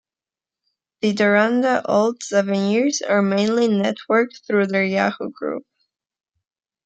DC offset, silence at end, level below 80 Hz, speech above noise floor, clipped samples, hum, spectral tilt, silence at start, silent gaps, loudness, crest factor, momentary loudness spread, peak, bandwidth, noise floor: under 0.1%; 1.25 s; -70 dBFS; over 71 dB; under 0.1%; none; -5 dB/octave; 1.05 s; none; -19 LUFS; 18 dB; 8 LU; -2 dBFS; 8.8 kHz; under -90 dBFS